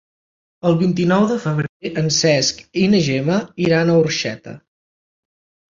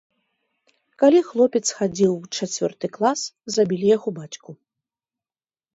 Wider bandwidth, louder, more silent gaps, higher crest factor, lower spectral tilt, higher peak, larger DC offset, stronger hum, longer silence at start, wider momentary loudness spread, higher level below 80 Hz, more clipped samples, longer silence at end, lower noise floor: about the same, 7.6 kHz vs 8 kHz; first, -17 LUFS vs -21 LUFS; first, 1.69-1.80 s vs none; about the same, 16 dB vs 18 dB; about the same, -5 dB/octave vs -4.5 dB/octave; about the same, -2 dBFS vs -4 dBFS; neither; neither; second, 0.65 s vs 1 s; second, 8 LU vs 12 LU; first, -54 dBFS vs -68 dBFS; neither; about the same, 1.2 s vs 1.2 s; about the same, under -90 dBFS vs under -90 dBFS